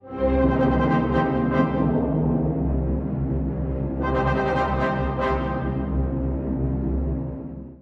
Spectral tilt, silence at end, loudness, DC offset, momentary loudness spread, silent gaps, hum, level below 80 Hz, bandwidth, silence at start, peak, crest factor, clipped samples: -9.5 dB/octave; 0.05 s; -23 LUFS; under 0.1%; 6 LU; none; none; -30 dBFS; 6 kHz; 0.05 s; -8 dBFS; 14 dB; under 0.1%